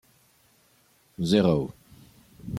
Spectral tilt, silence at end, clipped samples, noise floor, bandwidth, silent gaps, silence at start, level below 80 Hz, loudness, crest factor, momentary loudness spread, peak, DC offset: -7 dB/octave; 0 s; under 0.1%; -63 dBFS; 15.5 kHz; none; 1.2 s; -56 dBFS; -25 LUFS; 22 dB; 24 LU; -8 dBFS; under 0.1%